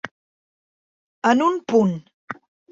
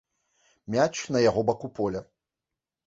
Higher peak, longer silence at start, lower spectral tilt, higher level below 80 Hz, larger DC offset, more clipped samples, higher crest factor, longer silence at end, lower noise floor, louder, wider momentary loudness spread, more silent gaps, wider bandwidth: first, -4 dBFS vs -8 dBFS; second, 0.05 s vs 0.7 s; first, -6.5 dB/octave vs -5 dB/octave; second, -66 dBFS vs -58 dBFS; neither; neither; about the same, 20 dB vs 20 dB; second, 0.4 s vs 0.85 s; about the same, under -90 dBFS vs -88 dBFS; first, -20 LUFS vs -26 LUFS; first, 19 LU vs 8 LU; first, 0.11-1.22 s, 2.14-2.28 s vs none; about the same, 7.8 kHz vs 8 kHz